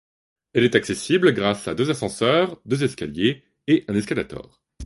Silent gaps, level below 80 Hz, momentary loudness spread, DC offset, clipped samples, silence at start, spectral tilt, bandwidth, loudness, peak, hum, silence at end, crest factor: none; -52 dBFS; 8 LU; under 0.1%; under 0.1%; 0.55 s; -5.5 dB/octave; 11.5 kHz; -22 LUFS; 0 dBFS; none; 0 s; 22 dB